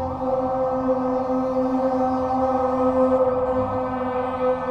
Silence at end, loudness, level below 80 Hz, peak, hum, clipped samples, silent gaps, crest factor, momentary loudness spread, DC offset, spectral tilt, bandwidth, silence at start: 0 s; -22 LUFS; -46 dBFS; -8 dBFS; none; under 0.1%; none; 14 dB; 5 LU; under 0.1%; -8.5 dB/octave; 6.6 kHz; 0 s